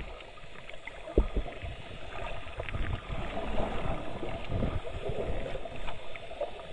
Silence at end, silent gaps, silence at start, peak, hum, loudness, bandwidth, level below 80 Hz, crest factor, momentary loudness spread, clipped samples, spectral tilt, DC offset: 0 s; none; 0 s; -12 dBFS; none; -38 LUFS; 10 kHz; -38 dBFS; 22 dB; 11 LU; under 0.1%; -7 dB/octave; under 0.1%